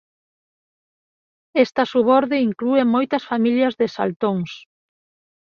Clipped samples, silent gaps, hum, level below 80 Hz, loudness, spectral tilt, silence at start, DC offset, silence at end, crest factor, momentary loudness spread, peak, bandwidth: under 0.1%; 4.16-4.20 s; none; -66 dBFS; -19 LUFS; -7 dB/octave; 1.55 s; under 0.1%; 1 s; 18 dB; 8 LU; -2 dBFS; 6.8 kHz